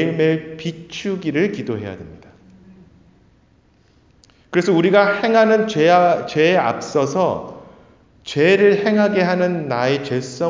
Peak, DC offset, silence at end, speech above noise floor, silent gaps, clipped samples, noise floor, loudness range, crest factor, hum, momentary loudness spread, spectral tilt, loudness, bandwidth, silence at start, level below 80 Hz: -2 dBFS; under 0.1%; 0 s; 38 dB; none; under 0.1%; -55 dBFS; 11 LU; 18 dB; none; 14 LU; -6 dB/octave; -17 LUFS; 7.6 kHz; 0 s; -56 dBFS